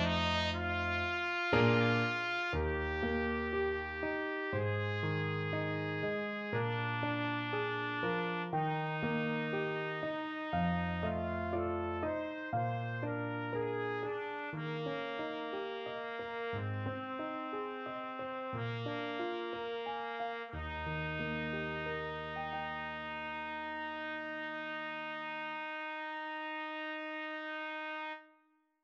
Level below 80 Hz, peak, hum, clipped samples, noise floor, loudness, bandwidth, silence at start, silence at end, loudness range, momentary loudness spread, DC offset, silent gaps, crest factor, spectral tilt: -56 dBFS; -18 dBFS; none; under 0.1%; -72 dBFS; -37 LUFS; 7.8 kHz; 0 s; 0.55 s; 7 LU; 6 LU; under 0.1%; none; 20 dB; -7 dB/octave